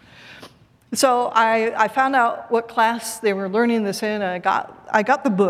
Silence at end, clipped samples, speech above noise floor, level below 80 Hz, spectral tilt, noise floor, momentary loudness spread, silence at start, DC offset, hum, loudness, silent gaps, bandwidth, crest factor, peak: 0 s; under 0.1%; 27 dB; -66 dBFS; -4 dB/octave; -47 dBFS; 6 LU; 0.25 s; under 0.1%; none; -20 LUFS; none; 16 kHz; 20 dB; 0 dBFS